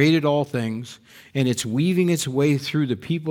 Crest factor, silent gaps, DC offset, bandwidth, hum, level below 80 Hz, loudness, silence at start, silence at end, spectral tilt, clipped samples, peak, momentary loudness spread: 16 dB; none; under 0.1%; 19 kHz; none; -62 dBFS; -22 LUFS; 0 s; 0 s; -5.5 dB/octave; under 0.1%; -4 dBFS; 9 LU